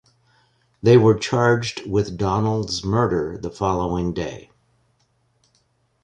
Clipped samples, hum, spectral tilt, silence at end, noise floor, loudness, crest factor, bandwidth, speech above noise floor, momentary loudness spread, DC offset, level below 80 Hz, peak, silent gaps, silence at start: under 0.1%; none; -6.5 dB/octave; 1.6 s; -65 dBFS; -20 LUFS; 18 dB; 10 kHz; 46 dB; 12 LU; under 0.1%; -44 dBFS; -4 dBFS; none; 0.85 s